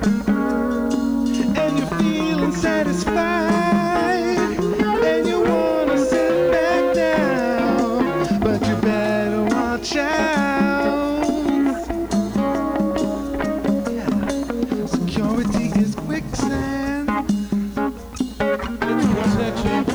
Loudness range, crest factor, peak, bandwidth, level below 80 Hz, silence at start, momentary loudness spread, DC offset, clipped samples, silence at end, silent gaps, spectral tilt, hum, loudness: 4 LU; 12 dB; -6 dBFS; over 20 kHz; -40 dBFS; 0 s; 5 LU; under 0.1%; under 0.1%; 0 s; none; -6 dB/octave; none; -20 LUFS